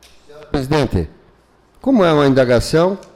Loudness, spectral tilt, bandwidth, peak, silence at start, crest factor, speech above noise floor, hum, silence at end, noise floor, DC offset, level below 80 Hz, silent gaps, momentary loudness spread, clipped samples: -15 LUFS; -6.5 dB/octave; 15.5 kHz; -4 dBFS; 0.35 s; 12 dB; 37 dB; none; 0.1 s; -52 dBFS; under 0.1%; -34 dBFS; none; 12 LU; under 0.1%